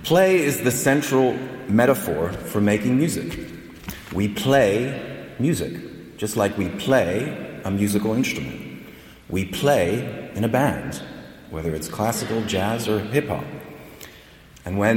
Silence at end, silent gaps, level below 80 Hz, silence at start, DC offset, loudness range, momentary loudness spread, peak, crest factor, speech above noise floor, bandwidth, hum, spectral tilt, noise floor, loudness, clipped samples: 0 s; none; -48 dBFS; 0 s; under 0.1%; 4 LU; 18 LU; -6 dBFS; 16 dB; 25 dB; 17.5 kHz; none; -5.5 dB/octave; -47 dBFS; -22 LUFS; under 0.1%